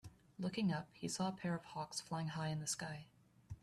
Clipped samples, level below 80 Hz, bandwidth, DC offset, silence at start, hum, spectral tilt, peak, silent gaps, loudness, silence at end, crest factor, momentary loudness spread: under 0.1%; -72 dBFS; 13.5 kHz; under 0.1%; 0.05 s; none; -4.5 dB/octave; -28 dBFS; none; -43 LUFS; 0.05 s; 16 dB; 9 LU